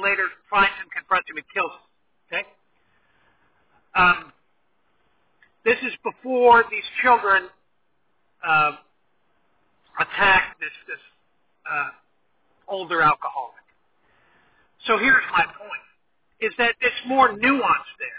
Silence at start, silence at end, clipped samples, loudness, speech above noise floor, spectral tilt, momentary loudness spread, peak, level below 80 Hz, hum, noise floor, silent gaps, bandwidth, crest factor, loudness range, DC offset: 0 s; 0 s; under 0.1%; -21 LUFS; 52 dB; -7 dB/octave; 17 LU; -4 dBFS; -56 dBFS; none; -72 dBFS; none; 4 kHz; 20 dB; 6 LU; under 0.1%